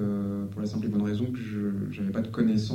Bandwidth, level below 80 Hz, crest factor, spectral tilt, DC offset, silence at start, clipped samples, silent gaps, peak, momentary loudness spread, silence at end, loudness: 9.2 kHz; -58 dBFS; 14 dB; -8 dB/octave; under 0.1%; 0 s; under 0.1%; none; -14 dBFS; 6 LU; 0 s; -30 LUFS